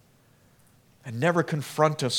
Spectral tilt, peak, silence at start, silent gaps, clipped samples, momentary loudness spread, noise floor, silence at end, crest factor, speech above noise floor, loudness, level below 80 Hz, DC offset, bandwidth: -5 dB/octave; -6 dBFS; 1.05 s; none; under 0.1%; 15 LU; -60 dBFS; 0 s; 22 dB; 35 dB; -25 LUFS; -72 dBFS; under 0.1%; 18 kHz